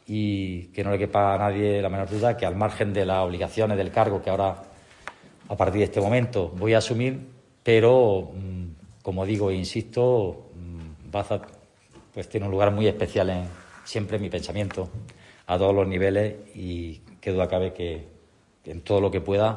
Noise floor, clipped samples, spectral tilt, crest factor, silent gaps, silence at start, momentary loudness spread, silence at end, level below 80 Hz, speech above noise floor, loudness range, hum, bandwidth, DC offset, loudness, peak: -58 dBFS; under 0.1%; -7 dB/octave; 18 dB; none; 0.1 s; 17 LU; 0 s; -54 dBFS; 34 dB; 5 LU; none; 11 kHz; under 0.1%; -25 LUFS; -6 dBFS